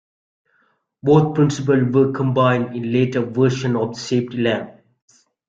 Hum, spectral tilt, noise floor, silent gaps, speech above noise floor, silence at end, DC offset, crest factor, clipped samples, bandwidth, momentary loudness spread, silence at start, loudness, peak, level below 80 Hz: none; -7 dB/octave; -64 dBFS; none; 46 dB; 0.8 s; under 0.1%; 16 dB; under 0.1%; 7.8 kHz; 7 LU; 1.05 s; -18 LUFS; -2 dBFS; -56 dBFS